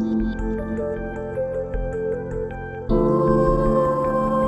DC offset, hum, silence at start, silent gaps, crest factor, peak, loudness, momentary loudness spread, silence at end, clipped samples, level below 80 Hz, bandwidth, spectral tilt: under 0.1%; none; 0 s; none; 16 dB; -4 dBFS; -23 LUFS; 10 LU; 0 s; under 0.1%; -32 dBFS; 8.4 kHz; -9.5 dB/octave